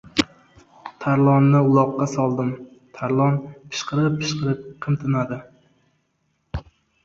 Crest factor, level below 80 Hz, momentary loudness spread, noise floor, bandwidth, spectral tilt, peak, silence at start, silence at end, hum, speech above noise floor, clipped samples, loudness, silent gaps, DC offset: 20 dB; -48 dBFS; 19 LU; -70 dBFS; 7.8 kHz; -7 dB/octave; -2 dBFS; 0.15 s; 0.45 s; none; 50 dB; under 0.1%; -21 LUFS; none; under 0.1%